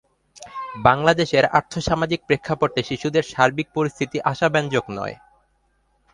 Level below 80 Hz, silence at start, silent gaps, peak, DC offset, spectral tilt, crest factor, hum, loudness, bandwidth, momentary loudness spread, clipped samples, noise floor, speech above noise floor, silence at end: -48 dBFS; 0.4 s; none; 0 dBFS; under 0.1%; -5.5 dB/octave; 22 dB; none; -21 LUFS; 11 kHz; 13 LU; under 0.1%; -65 dBFS; 45 dB; 1 s